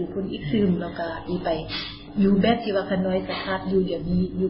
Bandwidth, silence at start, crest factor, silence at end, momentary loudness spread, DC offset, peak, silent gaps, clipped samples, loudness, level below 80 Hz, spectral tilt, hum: 5.8 kHz; 0 s; 16 dB; 0 s; 9 LU; under 0.1%; -8 dBFS; none; under 0.1%; -25 LUFS; -44 dBFS; -11.5 dB/octave; none